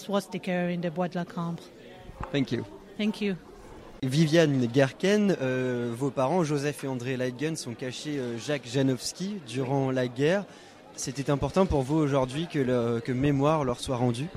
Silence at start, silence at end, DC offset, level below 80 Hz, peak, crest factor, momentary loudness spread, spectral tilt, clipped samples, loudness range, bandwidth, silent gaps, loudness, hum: 0 s; 0 s; under 0.1%; -50 dBFS; -10 dBFS; 18 dB; 11 LU; -6 dB/octave; under 0.1%; 6 LU; 14.5 kHz; none; -28 LUFS; none